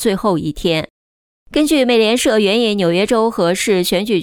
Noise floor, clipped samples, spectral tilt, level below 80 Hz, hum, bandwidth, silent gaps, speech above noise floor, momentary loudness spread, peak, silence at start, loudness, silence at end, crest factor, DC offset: under -90 dBFS; under 0.1%; -4.5 dB/octave; -42 dBFS; none; 18 kHz; 0.90-1.46 s; over 75 dB; 6 LU; -2 dBFS; 0 s; -15 LUFS; 0 s; 12 dB; under 0.1%